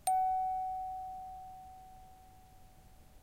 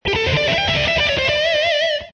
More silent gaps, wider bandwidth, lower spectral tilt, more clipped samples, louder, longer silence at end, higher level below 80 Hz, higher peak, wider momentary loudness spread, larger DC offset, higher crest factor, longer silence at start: neither; first, 16 kHz vs 9.4 kHz; about the same, -2.5 dB/octave vs -3.5 dB/octave; neither; second, -37 LUFS vs -16 LUFS; about the same, 0.05 s vs 0.05 s; second, -60 dBFS vs -36 dBFS; second, -22 dBFS vs -6 dBFS; first, 25 LU vs 1 LU; neither; first, 18 dB vs 12 dB; about the same, 0.05 s vs 0.05 s